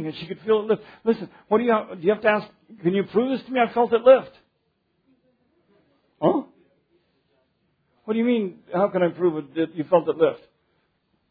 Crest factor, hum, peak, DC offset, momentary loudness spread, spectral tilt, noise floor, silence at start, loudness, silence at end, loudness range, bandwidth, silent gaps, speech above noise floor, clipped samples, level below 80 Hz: 20 dB; none; -4 dBFS; under 0.1%; 10 LU; -9.5 dB/octave; -71 dBFS; 0 s; -22 LUFS; 0.95 s; 10 LU; 5 kHz; none; 50 dB; under 0.1%; -68 dBFS